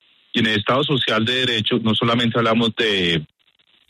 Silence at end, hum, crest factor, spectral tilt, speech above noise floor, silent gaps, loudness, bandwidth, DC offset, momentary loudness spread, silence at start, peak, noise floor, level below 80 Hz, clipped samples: 0.65 s; none; 14 dB; -5.5 dB/octave; 41 dB; none; -18 LUFS; 12.5 kHz; under 0.1%; 3 LU; 0.35 s; -6 dBFS; -60 dBFS; -56 dBFS; under 0.1%